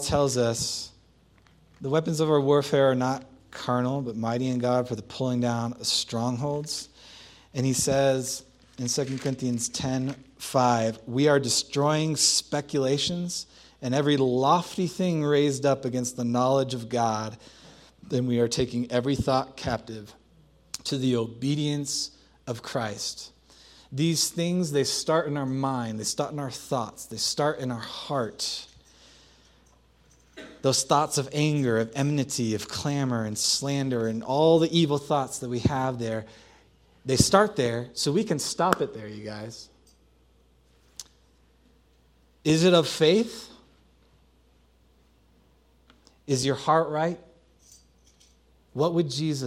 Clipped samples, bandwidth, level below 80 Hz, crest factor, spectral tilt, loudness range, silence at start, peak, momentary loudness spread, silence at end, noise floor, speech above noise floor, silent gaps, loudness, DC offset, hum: under 0.1%; 16 kHz; -56 dBFS; 26 dB; -4.5 dB/octave; 6 LU; 0 s; 0 dBFS; 14 LU; 0 s; -61 dBFS; 36 dB; none; -26 LUFS; under 0.1%; none